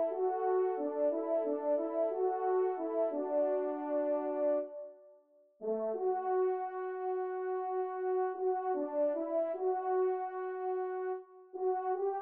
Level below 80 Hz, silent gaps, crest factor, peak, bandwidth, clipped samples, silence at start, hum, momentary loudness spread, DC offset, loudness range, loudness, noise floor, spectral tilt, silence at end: under -90 dBFS; none; 12 dB; -22 dBFS; 3.1 kHz; under 0.1%; 0 s; none; 6 LU; under 0.1%; 3 LU; -34 LUFS; -64 dBFS; -5.5 dB/octave; 0 s